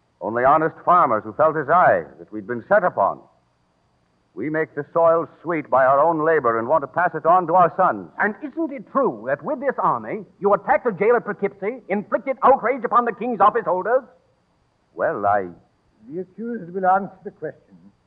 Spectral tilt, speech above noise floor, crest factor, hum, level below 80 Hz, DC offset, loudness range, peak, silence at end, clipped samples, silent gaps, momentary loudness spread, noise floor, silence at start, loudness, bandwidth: -10 dB/octave; 44 dB; 16 dB; none; -62 dBFS; under 0.1%; 7 LU; -6 dBFS; 0.55 s; under 0.1%; none; 15 LU; -64 dBFS; 0.2 s; -20 LUFS; 4.2 kHz